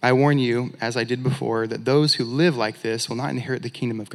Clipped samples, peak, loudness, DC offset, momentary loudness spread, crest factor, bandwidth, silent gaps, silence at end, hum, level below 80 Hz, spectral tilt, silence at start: under 0.1%; -2 dBFS; -22 LUFS; under 0.1%; 9 LU; 20 dB; 13 kHz; none; 0 s; none; -74 dBFS; -5.5 dB/octave; 0 s